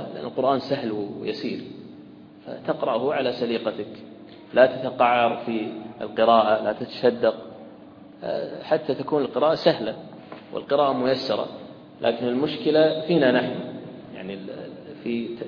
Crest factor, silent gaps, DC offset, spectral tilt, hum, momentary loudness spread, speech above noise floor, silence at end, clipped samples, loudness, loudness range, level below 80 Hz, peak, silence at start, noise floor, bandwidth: 22 dB; none; under 0.1%; -7.5 dB/octave; none; 20 LU; 22 dB; 0 s; under 0.1%; -23 LUFS; 6 LU; -66 dBFS; -2 dBFS; 0 s; -45 dBFS; 5.4 kHz